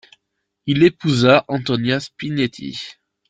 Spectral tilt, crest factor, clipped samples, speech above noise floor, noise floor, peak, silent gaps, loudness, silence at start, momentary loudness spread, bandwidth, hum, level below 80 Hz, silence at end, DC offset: -6 dB/octave; 18 dB; under 0.1%; 57 dB; -75 dBFS; 0 dBFS; none; -18 LUFS; 0.65 s; 16 LU; 9.2 kHz; none; -54 dBFS; 0.4 s; under 0.1%